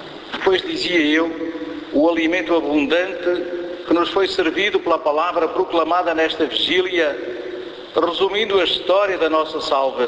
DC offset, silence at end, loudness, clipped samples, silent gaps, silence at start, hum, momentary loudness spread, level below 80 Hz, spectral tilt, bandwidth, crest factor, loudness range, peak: under 0.1%; 0 s; -19 LUFS; under 0.1%; none; 0 s; none; 10 LU; -54 dBFS; -4 dB/octave; 8 kHz; 16 dB; 1 LU; -4 dBFS